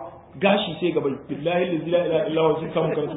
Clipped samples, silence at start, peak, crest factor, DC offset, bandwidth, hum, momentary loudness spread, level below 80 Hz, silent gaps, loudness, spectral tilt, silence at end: under 0.1%; 0 s; -4 dBFS; 18 dB; under 0.1%; 4 kHz; none; 6 LU; -58 dBFS; none; -23 LUFS; -11 dB/octave; 0 s